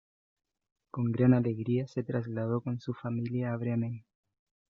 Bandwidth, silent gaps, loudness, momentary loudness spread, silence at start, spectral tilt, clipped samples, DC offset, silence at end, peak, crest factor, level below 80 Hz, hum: 6.6 kHz; none; -31 LUFS; 11 LU; 0.95 s; -9.5 dB/octave; under 0.1%; under 0.1%; 0.7 s; -12 dBFS; 20 dB; -70 dBFS; none